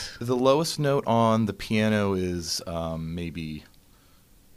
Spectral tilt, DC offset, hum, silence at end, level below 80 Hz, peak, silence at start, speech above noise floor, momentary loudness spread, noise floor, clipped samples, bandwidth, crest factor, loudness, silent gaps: -5.5 dB/octave; under 0.1%; none; 0.95 s; -50 dBFS; -8 dBFS; 0 s; 32 dB; 12 LU; -57 dBFS; under 0.1%; 15.5 kHz; 18 dB; -25 LUFS; none